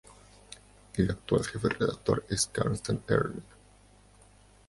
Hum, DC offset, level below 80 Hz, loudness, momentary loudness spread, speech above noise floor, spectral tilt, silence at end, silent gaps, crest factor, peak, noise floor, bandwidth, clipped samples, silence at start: 50 Hz at -50 dBFS; under 0.1%; -50 dBFS; -30 LUFS; 21 LU; 29 dB; -5 dB/octave; 1.25 s; none; 22 dB; -10 dBFS; -58 dBFS; 11.5 kHz; under 0.1%; 0.1 s